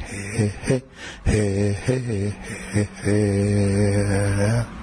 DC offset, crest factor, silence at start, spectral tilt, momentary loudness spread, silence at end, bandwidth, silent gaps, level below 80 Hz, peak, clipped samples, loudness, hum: under 0.1%; 14 dB; 0 s; -6.5 dB/octave; 8 LU; 0 s; 10.5 kHz; none; -36 dBFS; -8 dBFS; under 0.1%; -22 LUFS; none